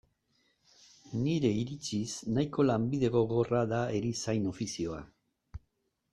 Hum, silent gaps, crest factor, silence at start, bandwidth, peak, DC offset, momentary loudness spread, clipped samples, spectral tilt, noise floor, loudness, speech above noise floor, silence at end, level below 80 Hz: none; none; 18 dB; 1.05 s; 12 kHz; -14 dBFS; under 0.1%; 14 LU; under 0.1%; -6 dB/octave; -79 dBFS; -32 LUFS; 48 dB; 0.55 s; -58 dBFS